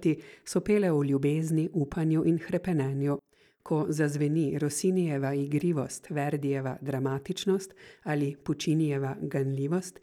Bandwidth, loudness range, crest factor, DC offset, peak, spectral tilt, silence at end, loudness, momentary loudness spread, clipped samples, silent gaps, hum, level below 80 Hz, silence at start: 15 kHz; 3 LU; 14 dB; under 0.1%; -14 dBFS; -6.5 dB/octave; 0.1 s; -29 LUFS; 6 LU; under 0.1%; none; none; -62 dBFS; 0 s